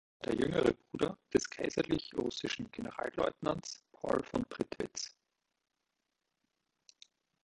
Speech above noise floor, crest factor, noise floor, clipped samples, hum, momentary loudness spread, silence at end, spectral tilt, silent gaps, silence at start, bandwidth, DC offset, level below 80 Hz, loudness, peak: 50 dB; 22 dB; -86 dBFS; under 0.1%; none; 9 LU; 2.35 s; -4.5 dB/octave; none; 0.2 s; 11.5 kHz; under 0.1%; -62 dBFS; -36 LUFS; -14 dBFS